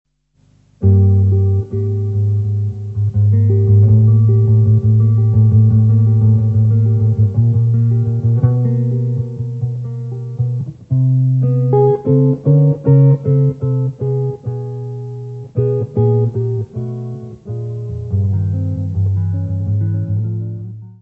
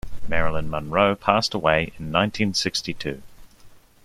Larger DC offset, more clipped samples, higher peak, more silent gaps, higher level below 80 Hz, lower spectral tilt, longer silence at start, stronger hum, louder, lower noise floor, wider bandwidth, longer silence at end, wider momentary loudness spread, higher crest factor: neither; neither; about the same, 0 dBFS vs -2 dBFS; neither; about the same, -42 dBFS vs -40 dBFS; first, -12.5 dB/octave vs -4.5 dB/octave; first, 0.8 s vs 0.05 s; neither; first, -15 LUFS vs -23 LUFS; first, -55 dBFS vs -48 dBFS; second, 1.5 kHz vs 14.5 kHz; second, 0.1 s vs 0.3 s; first, 13 LU vs 10 LU; second, 14 dB vs 20 dB